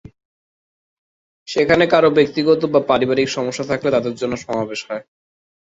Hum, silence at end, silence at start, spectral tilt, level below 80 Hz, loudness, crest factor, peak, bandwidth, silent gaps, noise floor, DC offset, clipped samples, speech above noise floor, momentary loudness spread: none; 0.75 s; 1.5 s; -5 dB/octave; -54 dBFS; -17 LUFS; 18 dB; 0 dBFS; 8 kHz; none; under -90 dBFS; under 0.1%; under 0.1%; over 73 dB; 11 LU